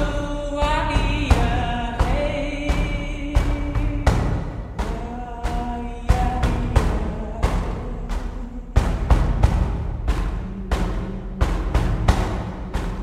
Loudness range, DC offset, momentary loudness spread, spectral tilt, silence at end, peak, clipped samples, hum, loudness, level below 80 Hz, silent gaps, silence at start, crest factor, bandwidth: 2 LU; under 0.1%; 9 LU; -6.5 dB/octave; 0 s; -2 dBFS; under 0.1%; none; -24 LUFS; -24 dBFS; none; 0 s; 20 dB; 11.5 kHz